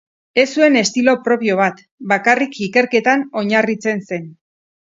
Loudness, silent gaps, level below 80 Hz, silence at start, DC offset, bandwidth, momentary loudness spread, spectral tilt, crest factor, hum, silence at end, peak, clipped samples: -16 LUFS; 1.91-1.98 s; -64 dBFS; 0.35 s; under 0.1%; 8 kHz; 8 LU; -4 dB/octave; 16 dB; none; 0.6 s; 0 dBFS; under 0.1%